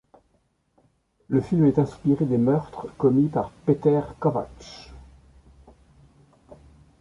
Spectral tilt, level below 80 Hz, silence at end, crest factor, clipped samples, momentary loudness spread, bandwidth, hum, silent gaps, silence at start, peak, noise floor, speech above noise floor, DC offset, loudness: -9.5 dB/octave; -52 dBFS; 0.45 s; 18 dB; under 0.1%; 17 LU; 10 kHz; none; none; 1.3 s; -8 dBFS; -68 dBFS; 46 dB; under 0.1%; -23 LUFS